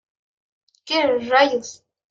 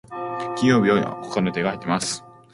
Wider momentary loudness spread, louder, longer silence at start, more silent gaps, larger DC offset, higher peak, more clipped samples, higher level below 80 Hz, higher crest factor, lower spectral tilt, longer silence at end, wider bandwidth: about the same, 11 LU vs 11 LU; first, -19 LUFS vs -22 LUFS; first, 0.85 s vs 0.1 s; neither; neither; about the same, -4 dBFS vs -4 dBFS; neither; second, -70 dBFS vs -58 dBFS; about the same, 20 dB vs 18 dB; second, -2.5 dB/octave vs -5 dB/octave; about the same, 0.35 s vs 0.25 s; second, 7.8 kHz vs 11.5 kHz